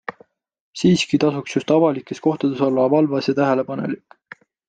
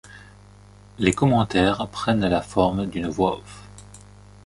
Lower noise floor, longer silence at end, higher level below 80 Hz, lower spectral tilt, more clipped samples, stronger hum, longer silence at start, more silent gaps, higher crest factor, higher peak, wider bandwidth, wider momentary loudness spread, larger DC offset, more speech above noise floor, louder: first, -54 dBFS vs -48 dBFS; first, 0.7 s vs 0.45 s; second, -60 dBFS vs -44 dBFS; about the same, -6 dB/octave vs -6 dB/octave; neither; second, none vs 50 Hz at -40 dBFS; about the same, 0.1 s vs 0.05 s; first, 0.60-0.73 s vs none; about the same, 16 dB vs 20 dB; about the same, -4 dBFS vs -4 dBFS; second, 9.2 kHz vs 11.5 kHz; second, 10 LU vs 16 LU; neither; first, 36 dB vs 26 dB; first, -19 LUFS vs -22 LUFS